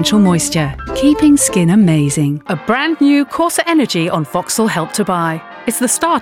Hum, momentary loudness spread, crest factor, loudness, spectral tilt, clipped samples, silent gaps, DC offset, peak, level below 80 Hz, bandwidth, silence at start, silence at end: none; 7 LU; 12 dB; -14 LUFS; -4.5 dB/octave; under 0.1%; none; under 0.1%; -2 dBFS; -40 dBFS; 17 kHz; 0 s; 0 s